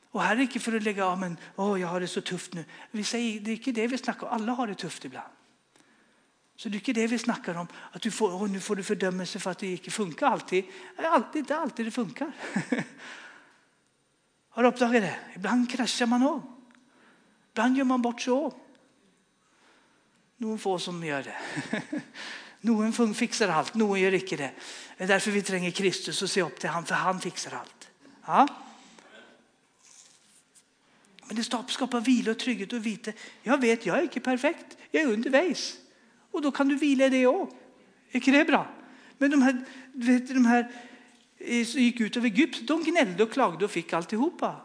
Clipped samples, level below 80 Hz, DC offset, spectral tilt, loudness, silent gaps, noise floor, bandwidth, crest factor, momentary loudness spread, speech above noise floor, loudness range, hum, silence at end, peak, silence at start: under 0.1%; -86 dBFS; under 0.1%; -4.5 dB/octave; -28 LUFS; none; -70 dBFS; 10.5 kHz; 22 dB; 14 LU; 43 dB; 8 LU; none; 0 s; -6 dBFS; 0.15 s